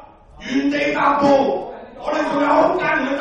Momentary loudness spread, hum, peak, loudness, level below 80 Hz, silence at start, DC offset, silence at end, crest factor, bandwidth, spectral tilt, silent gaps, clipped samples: 12 LU; none; -4 dBFS; -18 LUFS; -50 dBFS; 0 s; under 0.1%; 0 s; 14 dB; 8.4 kHz; -5.5 dB/octave; none; under 0.1%